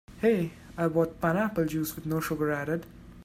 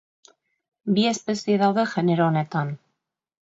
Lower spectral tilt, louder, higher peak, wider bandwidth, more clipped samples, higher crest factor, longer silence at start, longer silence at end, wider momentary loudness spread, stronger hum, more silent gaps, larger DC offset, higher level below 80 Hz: about the same, -6.5 dB/octave vs -6 dB/octave; second, -29 LUFS vs -23 LUFS; second, -12 dBFS vs -8 dBFS; first, 16 kHz vs 8 kHz; neither; about the same, 18 dB vs 16 dB; second, 0.1 s vs 0.85 s; second, 0 s vs 0.7 s; second, 7 LU vs 11 LU; neither; neither; neither; first, -54 dBFS vs -70 dBFS